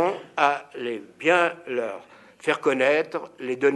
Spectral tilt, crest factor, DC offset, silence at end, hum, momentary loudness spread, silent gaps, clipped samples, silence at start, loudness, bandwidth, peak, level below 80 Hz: -4.5 dB/octave; 20 dB; under 0.1%; 0 s; none; 12 LU; none; under 0.1%; 0 s; -24 LUFS; 11.5 kHz; -4 dBFS; -78 dBFS